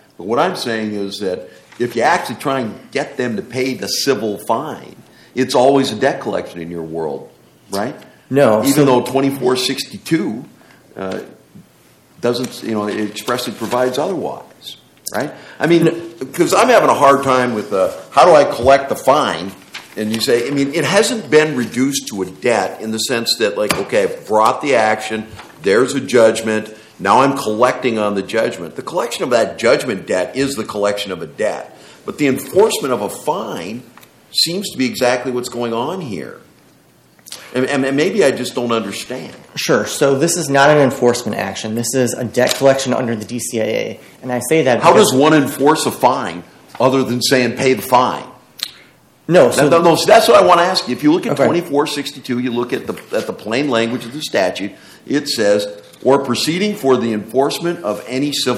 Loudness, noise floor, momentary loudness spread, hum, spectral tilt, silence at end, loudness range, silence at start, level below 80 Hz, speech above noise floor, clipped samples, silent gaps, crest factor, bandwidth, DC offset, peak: -16 LUFS; -50 dBFS; 15 LU; none; -4 dB/octave; 0 s; 7 LU; 0.2 s; -56 dBFS; 35 dB; under 0.1%; none; 16 dB; 16.5 kHz; under 0.1%; 0 dBFS